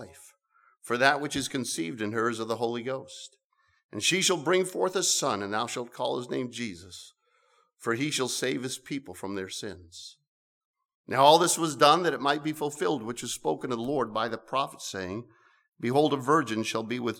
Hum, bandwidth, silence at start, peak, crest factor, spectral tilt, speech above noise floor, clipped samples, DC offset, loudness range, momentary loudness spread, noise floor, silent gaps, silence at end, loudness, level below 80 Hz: none; 19 kHz; 0 s; -6 dBFS; 24 dB; -3 dB/octave; 40 dB; under 0.1%; under 0.1%; 8 LU; 15 LU; -68 dBFS; 3.45-3.50 s, 3.84-3.89 s, 10.28-10.74 s, 10.95-11.04 s; 0 s; -28 LUFS; -70 dBFS